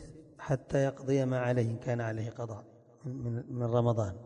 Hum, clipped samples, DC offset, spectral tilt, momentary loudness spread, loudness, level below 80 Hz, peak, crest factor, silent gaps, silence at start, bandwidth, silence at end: none; under 0.1%; under 0.1%; -8 dB/octave; 15 LU; -33 LUFS; -58 dBFS; -16 dBFS; 18 dB; none; 0 s; 9.6 kHz; 0 s